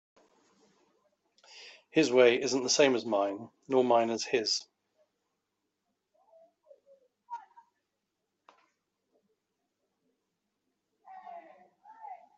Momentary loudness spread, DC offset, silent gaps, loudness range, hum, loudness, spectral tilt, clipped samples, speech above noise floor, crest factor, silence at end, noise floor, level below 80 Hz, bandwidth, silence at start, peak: 26 LU; under 0.1%; none; 10 LU; none; -27 LUFS; -3 dB/octave; under 0.1%; 57 dB; 24 dB; 0.2 s; -84 dBFS; -82 dBFS; 8.2 kHz; 1.55 s; -10 dBFS